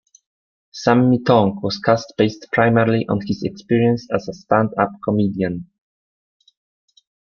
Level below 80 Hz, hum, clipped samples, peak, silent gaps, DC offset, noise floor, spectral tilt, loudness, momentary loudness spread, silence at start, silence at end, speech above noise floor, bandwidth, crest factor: -54 dBFS; none; under 0.1%; -2 dBFS; none; under 0.1%; under -90 dBFS; -7 dB/octave; -18 LUFS; 10 LU; 0.75 s; 1.75 s; over 72 dB; 7 kHz; 18 dB